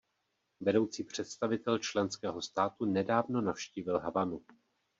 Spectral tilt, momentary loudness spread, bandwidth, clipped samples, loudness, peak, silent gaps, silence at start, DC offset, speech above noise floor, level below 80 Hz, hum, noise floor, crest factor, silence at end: -4.5 dB/octave; 7 LU; 8 kHz; under 0.1%; -34 LUFS; -14 dBFS; none; 0.6 s; under 0.1%; 48 dB; -72 dBFS; none; -81 dBFS; 20 dB; 0.6 s